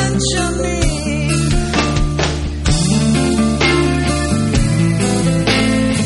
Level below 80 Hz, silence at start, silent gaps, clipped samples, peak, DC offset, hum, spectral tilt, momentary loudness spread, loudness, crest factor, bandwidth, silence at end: -24 dBFS; 0 s; none; under 0.1%; 0 dBFS; under 0.1%; none; -5 dB/octave; 4 LU; -15 LUFS; 14 dB; 11.5 kHz; 0 s